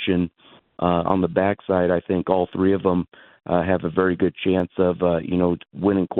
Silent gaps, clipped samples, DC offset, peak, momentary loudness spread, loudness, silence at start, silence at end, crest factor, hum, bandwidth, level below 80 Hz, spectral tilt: none; under 0.1%; under 0.1%; -4 dBFS; 4 LU; -22 LUFS; 0 s; 0 s; 18 dB; none; 4.1 kHz; -50 dBFS; -11 dB/octave